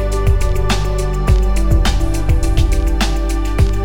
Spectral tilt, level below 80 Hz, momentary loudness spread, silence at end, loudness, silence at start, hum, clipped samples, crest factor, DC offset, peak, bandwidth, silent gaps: -5.5 dB/octave; -14 dBFS; 3 LU; 0 s; -17 LUFS; 0 s; none; under 0.1%; 12 dB; under 0.1%; 0 dBFS; 16 kHz; none